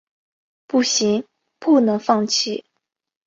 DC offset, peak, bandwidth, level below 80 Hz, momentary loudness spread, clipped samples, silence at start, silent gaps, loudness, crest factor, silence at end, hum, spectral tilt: under 0.1%; -2 dBFS; 7.8 kHz; -68 dBFS; 9 LU; under 0.1%; 0.75 s; none; -19 LUFS; 18 dB; 0.65 s; none; -3.5 dB/octave